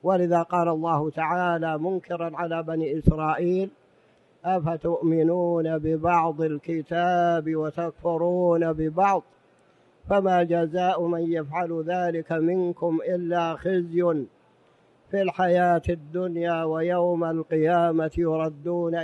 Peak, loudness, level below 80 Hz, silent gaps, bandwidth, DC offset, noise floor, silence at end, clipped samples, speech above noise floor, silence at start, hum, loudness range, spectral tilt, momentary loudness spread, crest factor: -4 dBFS; -25 LUFS; -48 dBFS; none; 7.8 kHz; under 0.1%; -60 dBFS; 0 s; under 0.1%; 36 dB; 0.05 s; none; 2 LU; -8.5 dB/octave; 7 LU; 22 dB